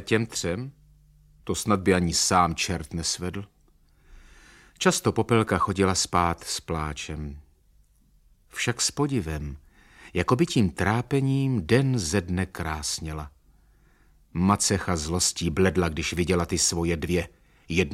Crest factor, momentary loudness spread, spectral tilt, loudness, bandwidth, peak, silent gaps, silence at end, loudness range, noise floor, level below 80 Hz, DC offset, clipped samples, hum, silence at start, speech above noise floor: 20 dB; 13 LU; -4.5 dB/octave; -25 LUFS; 16 kHz; -6 dBFS; none; 0 s; 4 LU; -60 dBFS; -44 dBFS; under 0.1%; under 0.1%; none; 0 s; 35 dB